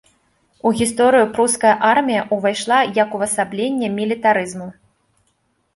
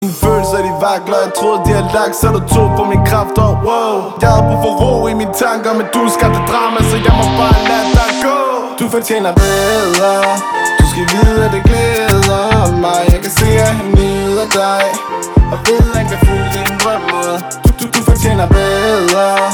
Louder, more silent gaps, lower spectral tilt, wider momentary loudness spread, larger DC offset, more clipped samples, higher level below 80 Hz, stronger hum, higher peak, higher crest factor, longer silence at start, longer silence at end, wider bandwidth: second, -17 LUFS vs -12 LUFS; neither; second, -3.5 dB/octave vs -5 dB/octave; first, 7 LU vs 4 LU; neither; neither; second, -56 dBFS vs -18 dBFS; neither; about the same, -2 dBFS vs 0 dBFS; first, 16 dB vs 10 dB; first, 0.65 s vs 0 s; first, 1.05 s vs 0 s; second, 12 kHz vs over 20 kHz